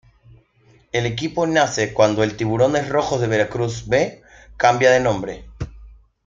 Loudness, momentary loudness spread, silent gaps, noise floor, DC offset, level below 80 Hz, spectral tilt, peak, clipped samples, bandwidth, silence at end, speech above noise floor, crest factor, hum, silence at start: -19 LUFS; 12 LU; none; -55 dBFS; under 0.1%; -44 dBFS; -5 dB/octave; -2 dBFS; under 0.1%; 7.6 kHz; 0.35 s; 37 dB; 18 dB; none; 0.95 s